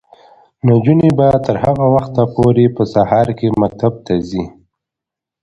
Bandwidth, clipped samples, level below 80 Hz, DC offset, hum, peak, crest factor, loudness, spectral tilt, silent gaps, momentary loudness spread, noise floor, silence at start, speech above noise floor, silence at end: 8.2 kHz; under 0.1%; -40 dBFS; under 0.1%; none; 0 dBFS; 14 dB; -14 LUFS; -9.5 dB/octave; none; 8 LU; -84 dBFS; 0.65 s; 72 dB; 0.95 s